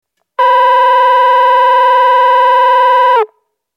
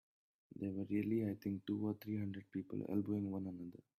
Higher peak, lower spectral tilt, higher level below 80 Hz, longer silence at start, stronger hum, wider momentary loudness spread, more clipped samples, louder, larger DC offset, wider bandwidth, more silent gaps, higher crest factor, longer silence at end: first, 0 dBFS vs -26 dBFS; second, 1 dB/octave vs -9.5 dB/octave; second, under -90 dBFS vs -78 dBFS; second, 0.4 s vs 0.55 s; neither; second, 5 LU vs 8 LU; neither; first, -8 LUFS vs -42 LUFS; neither; about the same, 15 kHz vs 15 kHz; neither; second, 8 dB vs 16 dB; first, 0.5 s vs 0.25 s